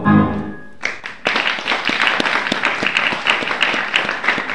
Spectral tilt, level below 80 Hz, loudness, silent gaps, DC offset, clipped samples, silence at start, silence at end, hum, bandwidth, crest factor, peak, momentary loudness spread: -4 dB/octave; -48 dBFS; -17 LUFS; none; 1%; under 0.1%; 0 s; 0 s; none; 12 kHz; 18 dB; 0 dBFS; 9 LU